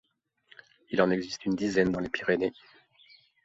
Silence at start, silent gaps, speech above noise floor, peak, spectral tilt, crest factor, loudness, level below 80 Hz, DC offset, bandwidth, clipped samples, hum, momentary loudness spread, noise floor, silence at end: 0.9 s; none; 35 dB; -10 dBFS; -6 dB/octave; 22 dB; -29 LUFS; -60 dBFS; under 0.1%; 8 kHz; under 0.1%; none; 6 LU; -63 dBFS; 0.9 s